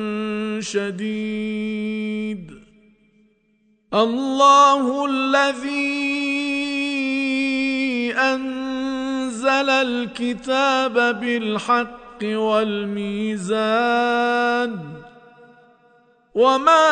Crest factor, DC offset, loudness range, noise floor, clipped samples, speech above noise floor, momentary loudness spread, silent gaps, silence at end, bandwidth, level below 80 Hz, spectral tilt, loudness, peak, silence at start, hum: 18 dB; under 0.1%; 8 LU; -62 dBFS; under 0.1%; 43 dB; 10 LU; none; 0 s; 9.4 kHz; -60 dBFS; -4 dB/octave; -20 LUFS; -2 dBFS; 0 s; none